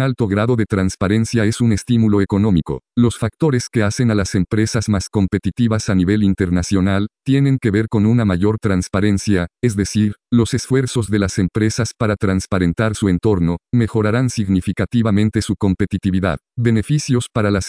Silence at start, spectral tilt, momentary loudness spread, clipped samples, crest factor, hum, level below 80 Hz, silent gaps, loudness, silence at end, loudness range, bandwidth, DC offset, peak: 0 s; -6.5 dB/octave; 3 LU; under 0.1%; 14 dB; none; -38 dBFS; none; -17 LUFS; 0 s; 1 LU; 10.5 kHz; under 0.1%; -2 dBFS